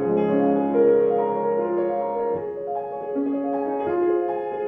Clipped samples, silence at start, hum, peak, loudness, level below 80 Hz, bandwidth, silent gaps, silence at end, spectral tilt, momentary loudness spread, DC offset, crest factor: under 0.1%; 0 s; none; -8 dBFS; -23 LUFS; -62 dBFS; 3.6 kHz; none; 0 s; -11 dB/octave; 10 LU; under 0.1%; 14 dB